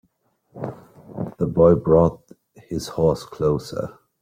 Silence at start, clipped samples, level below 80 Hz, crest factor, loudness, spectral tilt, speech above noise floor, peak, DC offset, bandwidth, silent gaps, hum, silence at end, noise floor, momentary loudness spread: 0.55 s; under 0.1%; -46 dBFS; 18 dB; -20 LUFS; -8 dB/octave; 47 dB; -4 dBFS; under 0.1%; 15.5 kHz; none; none; 0.3 s; -66 dBFS; 18 LU